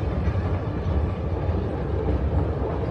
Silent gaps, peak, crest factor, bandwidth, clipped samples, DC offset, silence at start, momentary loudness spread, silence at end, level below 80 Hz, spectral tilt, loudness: none; -12 dBFS; 12 dB; 6 kHz; under 0.1%; under 0.1%; 0 s; 2 LU; 0 s; -28 dBFS; -9.5 dB/octave; -26 LUFS